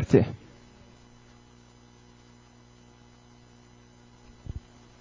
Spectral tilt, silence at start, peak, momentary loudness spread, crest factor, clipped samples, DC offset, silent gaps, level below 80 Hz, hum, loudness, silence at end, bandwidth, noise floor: -8.5 dB/octave; 0 s; -6 dBFS; 19 LU; 28 dB; under 0.1%; under 0.1%; none; -50 dBFS; 60 Hz at -55 dBFS; -29 LUFS; 0.4 s; 7.6 kHz; -55 dBFS